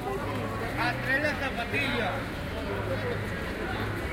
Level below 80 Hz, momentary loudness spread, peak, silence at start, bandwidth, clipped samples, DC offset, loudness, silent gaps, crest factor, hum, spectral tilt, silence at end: -44 dBFS; 7 LU; -16 dBFS; 0 s; 16.5 kHz; under 0.1%; under 0.1%; -30 LUFS; none; 16 dB; none; -5.5 dB/octave; 0 s